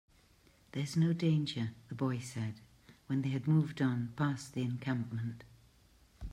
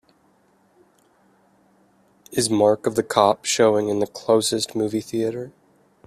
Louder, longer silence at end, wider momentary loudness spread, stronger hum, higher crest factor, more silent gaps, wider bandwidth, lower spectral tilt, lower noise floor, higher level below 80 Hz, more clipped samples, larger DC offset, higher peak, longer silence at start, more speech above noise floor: second, -35 LUFS vs -21 LUFS; second, 0 s vs 0.6 s; first, 12 LU vs 8 LU; neither; second, 16 dB vs 22 dB; neither; second, 12.5 kHz vs 15.5 kHz; first, -7 dB/octave vs -4 dB/octave; first, -66 dBFS vs -60 dBFS; about the same, -60 dBFS vs -62 dBFS; neither; neither; second, -20 dBFS vs 0 dBFS; second, 0.75 s vs 2.3 s; second, 31 dB vs 40 dB